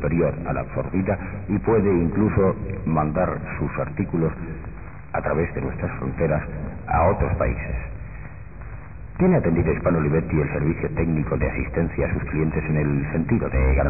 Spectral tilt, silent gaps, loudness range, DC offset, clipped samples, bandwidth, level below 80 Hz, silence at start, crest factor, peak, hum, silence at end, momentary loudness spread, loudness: -15 dB/octave; none; 3 LU; 0.9%; under 0.1%; 2.7 kHz; -32 dBFS; 0 s; 14 dB; -8 dBFS; none; 0 s; 15 LU; -23 LUFS